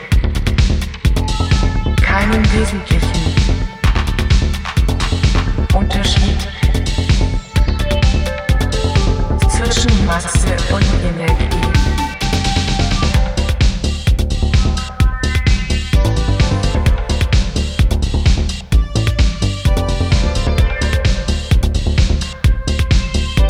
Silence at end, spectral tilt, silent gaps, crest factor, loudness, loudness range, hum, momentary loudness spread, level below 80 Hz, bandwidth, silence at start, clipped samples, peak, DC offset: 0 s; -5 dB/octave; none; 10 dB; -16 LUFS; 1 LU; none; 3 LU; -16 dBFS; 14 kHz; 0 s; under 0.1%; -2 dBFS; under 0.1%